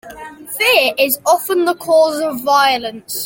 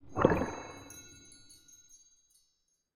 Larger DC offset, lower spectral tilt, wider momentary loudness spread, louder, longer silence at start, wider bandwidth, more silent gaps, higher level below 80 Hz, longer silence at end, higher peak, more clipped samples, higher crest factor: neither; second, -1.5 dB/octave vs -6 dB/octave; second, 13 LU vs 27 LU; first, -14 LUFS vs -32 LUFS; about the same, 0.05 s vs 0.05 s; about the same, 17 kHz vs 16 kHz; neither; about the same, -58 dBFS vs -56 dBFS; second, 0 s vs 1.5 s; first, 0 dBFS vs -8 dBFS; neither; second, 14 dB vs 30 dB